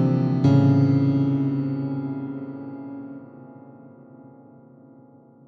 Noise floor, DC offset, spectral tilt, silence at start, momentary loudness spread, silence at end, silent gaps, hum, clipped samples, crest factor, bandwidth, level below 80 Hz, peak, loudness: -50 dBFS; under 0.1%; -10.5 dB/octave; 0 s; 21 LU; 1.2 s; none; none; under 0.1%; 18 dB; 6.2 kHz; -56 dBFS; -6 dBFS; -21 LUFS